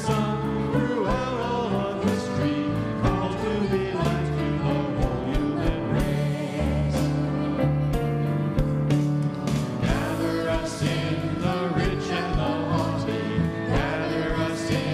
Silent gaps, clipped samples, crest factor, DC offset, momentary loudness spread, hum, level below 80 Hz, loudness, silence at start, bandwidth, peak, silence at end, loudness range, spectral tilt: none; under 0.1%; 16 dB; under 0.1%; 2 LU; none; -36 dBFS; -25 LUFS; 0 s; 14 kHz; -10 dBFS; 0 s; 1 LU; -7 dB/octave